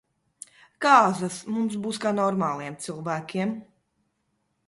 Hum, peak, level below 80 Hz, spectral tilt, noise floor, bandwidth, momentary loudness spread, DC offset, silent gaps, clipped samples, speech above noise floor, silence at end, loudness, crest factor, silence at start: none; -4 dBFS; -70 dBFS; -5 dB/octave; -74 dBFS; 11.5 kHz; 24 LU; under 0.1%; none; under 0.1%; 50 dB; 1.05 s; -25 LUFS; 22 dB; 0.8 s